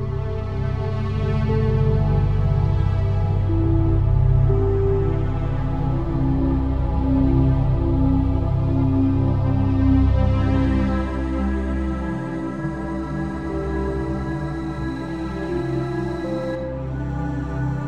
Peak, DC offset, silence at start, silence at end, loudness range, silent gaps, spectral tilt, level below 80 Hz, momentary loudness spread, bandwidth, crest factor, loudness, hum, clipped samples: -6 dBFS; 2%; 0 s; 0 s; 7 LU; none; -9.5 dB/octave; -26 dBFS; 8 LU; 6.2 kHz; 14 dB; -22 LUFS; none; under 0.1%